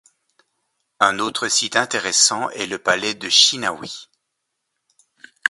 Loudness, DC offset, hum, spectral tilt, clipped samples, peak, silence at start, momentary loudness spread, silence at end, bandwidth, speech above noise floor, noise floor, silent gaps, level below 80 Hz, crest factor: -17 LUFS; under 0.1%; none; 0 dB/octave; under 0.1%; 0 dBFS; 1 s; 12 LU; 0 s; 12 kHz; 57 dB; -77 dBFS; none; -66 dBFS; 22 dB